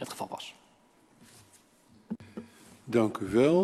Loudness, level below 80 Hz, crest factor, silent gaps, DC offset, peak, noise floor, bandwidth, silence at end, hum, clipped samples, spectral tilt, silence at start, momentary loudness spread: -31 LUFS; -66 dBFS; 20 dB; none; under 0.1%; -12 dBFS; -63 dBFS; 13 kHz; 0 s; none; under 0.1%; -6.5 dB/octave; 0 s; 22 LU